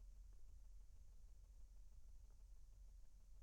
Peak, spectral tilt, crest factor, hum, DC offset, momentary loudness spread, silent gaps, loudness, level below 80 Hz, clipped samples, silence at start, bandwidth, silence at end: -52 dBFS; -5 dB/octave; 8 dB; none; under 0.1%; 2 LU; none; -68 LUFS; -62 dBFS; under 0.1%; 0 s; 10.5 kHz; 0 s